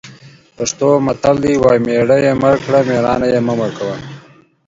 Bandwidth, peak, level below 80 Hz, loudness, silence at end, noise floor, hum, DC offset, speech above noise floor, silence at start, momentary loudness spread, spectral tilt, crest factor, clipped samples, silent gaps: 7.8 kHz; 0 dBFS; -44 dBFS; -14 LUFS; 0.5 s; -44 dBFS; none; under 0.1%; 31 dB; 0.05 s; 10 LU; -6 dB/octave; 14 dB; under 0.1%; none